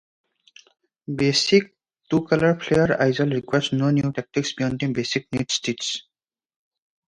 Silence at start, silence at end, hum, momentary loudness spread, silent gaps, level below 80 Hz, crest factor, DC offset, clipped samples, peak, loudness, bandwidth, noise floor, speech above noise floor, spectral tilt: 1.1 s; 1.1 s; none; 8 LU; none; -54 dBFS; 20 dB; under 0.1%; under 0.1%; -4 dBFS; -22 LUFS; 11 kHz; -54 dBFS; 32 dB; -5 dB/octave